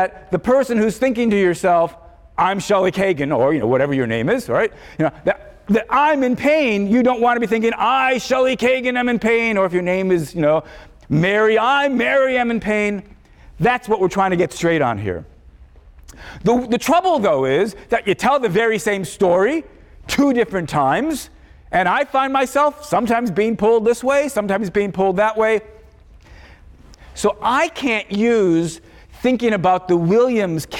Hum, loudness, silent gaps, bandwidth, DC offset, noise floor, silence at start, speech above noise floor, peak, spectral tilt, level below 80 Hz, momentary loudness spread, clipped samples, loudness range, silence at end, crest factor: none; -17 LUFS; none; 17 kHz; under 0.1%; -45 dBFS; 0 s; 28 dB; -6 dBFS; -5.5 dB/octave; -46 dBFS; 7 LU; under 0.1%; 4 LU; 0 s; 12 dB